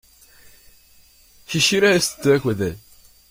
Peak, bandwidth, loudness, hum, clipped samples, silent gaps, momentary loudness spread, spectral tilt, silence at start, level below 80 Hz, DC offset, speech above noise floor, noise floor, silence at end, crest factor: -4 dBFS; 16.5 kHz; -19 LUFS; none; under 0.1%; none; 12 LU; -3.5 dB/octave; 1.5 s; -52 dBFS; under 0.1%; 34 dB; -52 dBFS; 0.55 s; 18 dB